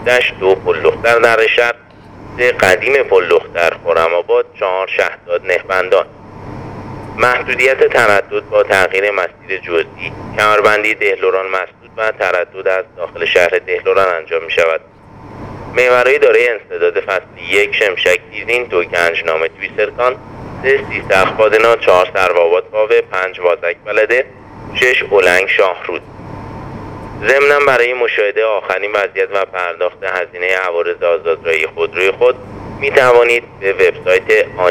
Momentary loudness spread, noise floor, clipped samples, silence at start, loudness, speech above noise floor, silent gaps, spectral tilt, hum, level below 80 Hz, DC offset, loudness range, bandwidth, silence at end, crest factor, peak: 13 LU; -35 dBFS; under 0.1%; 0 s; -13 LUFS; 22 dB; none; -3.5 dB/octave; none; -46 dBFS; under 0.1%; 3 LU; 17.5 kHz; 0 s; 14 dB; 0 dBFS